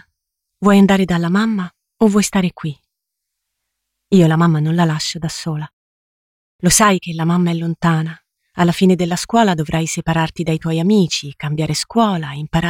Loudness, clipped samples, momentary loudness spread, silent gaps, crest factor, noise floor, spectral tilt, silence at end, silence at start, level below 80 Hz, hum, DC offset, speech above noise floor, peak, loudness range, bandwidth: -16 LUFS; under 0.1%; 12 LU; 5.73-6.59 s; 16 dB; -78 dBFS; -5 dB/octave; 0 s; 0.6 s; -44 dBFS; none; under 0.1%; 63 dB; -2 dBFS; 2 LU; 16.5 kHz